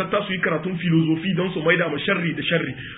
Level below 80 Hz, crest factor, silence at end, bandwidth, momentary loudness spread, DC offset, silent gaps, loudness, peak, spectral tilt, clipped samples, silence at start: -56 dBFS; 18 dB; 0 s; 4 kHz; 4 LU; under 0.1%; none; -22 LUFS; -4 dBFS; -11 dB/octave; under 0.1%; 0 s